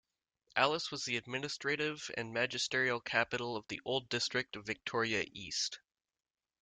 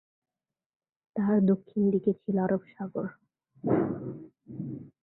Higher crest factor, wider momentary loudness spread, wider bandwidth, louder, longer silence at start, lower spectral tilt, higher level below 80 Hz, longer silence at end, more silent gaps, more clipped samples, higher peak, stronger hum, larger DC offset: first, 24 dB vs 18 dB; second, 8 LU vs 15 LU; first, 9.6 kHz vs 4 kHz; second, -35 LUFS vs -29 LUFS; second, 0.55 s vs 1.15 s; second, -2.5 dB/octave vs -13 dB/octave; second, -74 dBFS vs -66 dBFS; first, 0.85 s vs 0.15 s; neither; neither; about the same, -14 dBFS vs -12 dBFS; neither; neither